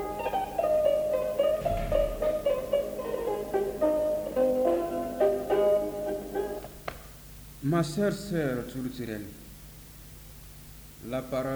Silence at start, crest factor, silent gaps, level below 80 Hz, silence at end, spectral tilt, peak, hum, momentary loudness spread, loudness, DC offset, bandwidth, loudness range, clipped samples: 0 s; 16 dB; none; -46 dBFS; 0 s; -6.5 dB/octave; -12 dBFS; none; 21 LU; -29 LUFS; under 0.1%; over 20 kHz; 5 LU; under 0.1%